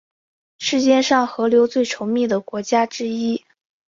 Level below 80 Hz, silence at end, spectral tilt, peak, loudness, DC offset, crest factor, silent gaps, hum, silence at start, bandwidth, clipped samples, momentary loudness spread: -64 dBFS; 0.5 s; -3.5 dB/octave; -4 dBFS; -19 LUFS; under 0.1%; 16 dB; none; none; 0.6 s; 7.6 kHz; under 0.1%; 8 LU